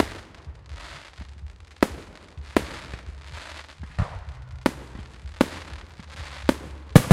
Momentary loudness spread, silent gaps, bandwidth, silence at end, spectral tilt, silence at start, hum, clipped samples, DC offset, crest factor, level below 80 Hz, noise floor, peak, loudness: 17 LU; none; 16 kHz; 0 s; -6.5 dB/octave; 0 s; none; under 0.1%; under 0.1%; 26 dB; -40 dBFS; -43 dBFS; 0 dBFS; -27 LUFS